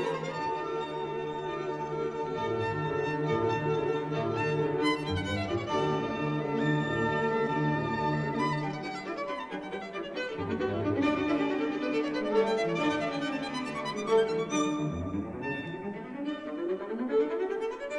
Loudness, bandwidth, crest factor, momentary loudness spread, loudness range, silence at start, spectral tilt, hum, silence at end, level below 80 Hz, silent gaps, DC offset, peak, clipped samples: -31 LUFS; 11 kHz; 16 dB; 7 LU; 3 LU; 0 s; -6 dB/octave; none; 0 s; -58 dBFS; none; under 0.1%; -14 dBFS; under 0.1%